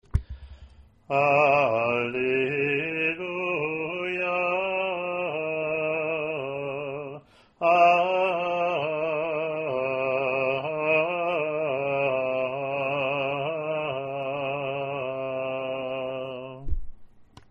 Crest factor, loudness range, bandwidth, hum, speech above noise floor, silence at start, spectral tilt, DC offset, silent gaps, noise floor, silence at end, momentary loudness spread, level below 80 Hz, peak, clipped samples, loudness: 20 dB; 5 LU; 7.4 kHz; none; 28 dB; 0.15 s; -7 dB/octave; under 0.1%; none; -51 dBFS; 0.25 s; 10 LU; -44 dBFS; -8 dBFS; under 0.1%; -26 LUFS